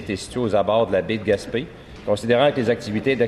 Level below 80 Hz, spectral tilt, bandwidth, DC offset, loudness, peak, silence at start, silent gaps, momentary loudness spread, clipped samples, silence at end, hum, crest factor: -48 dBFS; -6 dB/octave; 12.5 kHz; under 0.1%; -21 LUFS; -4 dBFS; 0 s; none; 10 LU; under 0.1%; 0 s; none; 16 dB